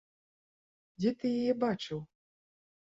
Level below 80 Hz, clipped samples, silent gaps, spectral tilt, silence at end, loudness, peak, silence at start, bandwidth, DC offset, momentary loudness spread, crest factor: -72 dBFS; under 0.1%; none; -7 dB/octave; 0.85 s; -33 LUFS; -18 dBFS; 1 s; 7.8 kHz; under 0.1%; 9 LU; 18 dB